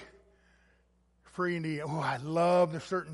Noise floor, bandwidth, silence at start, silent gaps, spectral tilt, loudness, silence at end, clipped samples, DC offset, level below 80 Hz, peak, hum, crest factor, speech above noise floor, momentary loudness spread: -69 dBFS; 11.5 kHz; 0 s; none; -6.5 dB/octave; -31 LUFS; 0 s; under 0.1%; under 0.1%; -68 dBFS; -16 dBFS; none; 18 dB; 39 dB; 9 LU